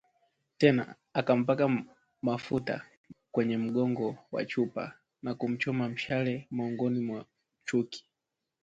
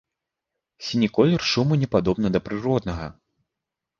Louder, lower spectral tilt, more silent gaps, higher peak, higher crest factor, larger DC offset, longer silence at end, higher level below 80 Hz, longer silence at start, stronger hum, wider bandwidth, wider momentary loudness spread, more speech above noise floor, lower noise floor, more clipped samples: second, -31 LUFS vs -22 LUFS; about the same, -7 dB/octave vs -6.5 dB/octave; first, 2.97-3.04 s vs none; second, -8 dBFS vs -4 dBFS; about the same, 22 dB vs 20 dB; neither; second, 0.65 s vs 0.9 s; second, -70 dBFS vs -46 dBFS; second, 0.6 s vs 0.8 s; neither; about the same, 7.8 kHz vs 7.4 kHz; about the same, 13 LU vs 13 LU; second, 57 dB vs 63 dB; about the same, -87 dBFS vs -85 dBFS; neither